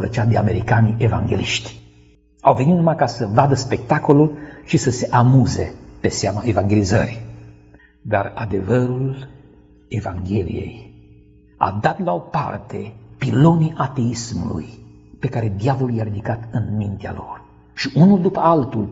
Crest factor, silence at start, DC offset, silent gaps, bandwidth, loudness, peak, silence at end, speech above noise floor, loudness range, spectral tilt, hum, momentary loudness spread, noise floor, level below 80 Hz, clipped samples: 18 dB; 0 s; under 0.1%; none; 8 kHz; -19 LUFS; 0 dBFS; 0 s; 33 dB; 7 LU; -6.5 dB/octave; none; 15 LU; -51 dBFS; -44 dBFS; under 0.1%